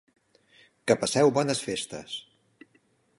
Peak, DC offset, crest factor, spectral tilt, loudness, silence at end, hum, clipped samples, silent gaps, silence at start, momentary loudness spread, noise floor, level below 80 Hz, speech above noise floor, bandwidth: -8 dBFS; under 0.1%; 22 dB; -4 dB/octave; -26 LUFS; 1 s; none; under 0.1%; none; 0.85 s; 15 LU; -67 dBFS; -68 dBFS; 41 dB; 11.5 kHz